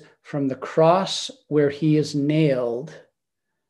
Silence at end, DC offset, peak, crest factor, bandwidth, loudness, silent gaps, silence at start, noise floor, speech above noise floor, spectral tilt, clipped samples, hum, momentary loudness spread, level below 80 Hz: 0.7 s; under 0.1%; -4 dBFS; 18 dB; 11.5 kHz; -22 LUFS; none; 0.3 s; -82 dBFS; 61 dB; -6 dB/octave; under 0.1%; none; 11 LU; -70 dBFS